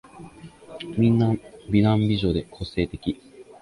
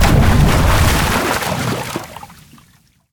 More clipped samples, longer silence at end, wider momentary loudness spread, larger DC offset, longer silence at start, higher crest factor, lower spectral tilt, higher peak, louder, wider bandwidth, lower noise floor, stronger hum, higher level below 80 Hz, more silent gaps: neither; second, 0.2 s vs 0.8 s; first, 19 LU vs 15 LU; neither; first, 0.15 s vs 0 s; about the same, 18 dB vs 14 dB; first, -8.5 dB/octave vs -5 dB/octave; second, -6 dBFS vs 0 dBFS; second, -23 LUFS vs -15 LUFS; second, 11 kHz vs 19.5 kHz; second, -44 dBFS vs -52 dBFS; neither; second, -44 dBFS vs -20 dBFS; neither